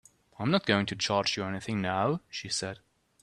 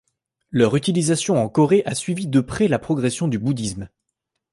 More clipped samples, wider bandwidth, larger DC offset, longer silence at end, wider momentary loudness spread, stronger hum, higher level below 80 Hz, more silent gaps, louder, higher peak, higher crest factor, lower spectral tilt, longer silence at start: neither; about the same, 12 kHz vs 11.5 kHz; neither; second, 0.45 s vs 0.65 s; about the same, 9 LU vs 9 LU; neither; second, -66 dBFS vs -50 dBFS; neither; second, -30 LUFS vs -20 LUFS; second, -10 dBFS vs -4 dBFS; about the same, 22 dB vs 18 dB; about the same, -4.5 dB/octave vs -5.5 dB/octave; about the same, 0.4 s vs 0.5 s